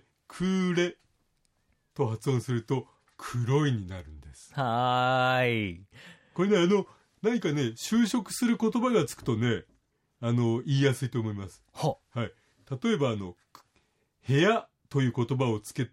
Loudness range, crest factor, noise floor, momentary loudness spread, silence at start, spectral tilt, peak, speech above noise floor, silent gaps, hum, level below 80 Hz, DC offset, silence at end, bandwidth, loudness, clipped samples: 4 LU; 18 dB; -72 dBFS; 16 LU; 0.3 s; -6 dB/octave; -12 dBFS; 45 dB; none; none; -62 dBFS; under 0.1%; 0.05 s; 16 kHz; -28 LUFS; under 0.1%